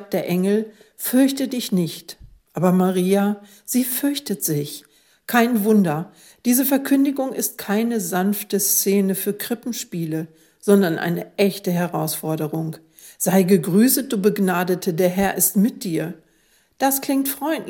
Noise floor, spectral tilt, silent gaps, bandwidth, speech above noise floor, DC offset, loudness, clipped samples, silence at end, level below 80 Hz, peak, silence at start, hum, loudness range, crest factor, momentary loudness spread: -60 dBFS; -5 dB/octave; none; 17.5 kHz; 40 dB; under 0.1%; -20 LUFS; under 0.1%; 0 s; -60 dBFS; 0 dBFS; 0 s; none; 3 LU; 20 dB; 11 LU